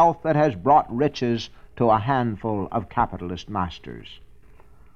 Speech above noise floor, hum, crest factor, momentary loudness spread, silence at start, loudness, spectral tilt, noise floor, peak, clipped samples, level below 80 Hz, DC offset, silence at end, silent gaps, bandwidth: 29 dB; none; 18 dB; 14 LU; 0 s; -23 LUFS; -7.5 dB/octave; -51 dBFS; -6 dBFS; under 0.1%; -46 dBFS; 0.4%; 0.8 s; none; 7.2 kHz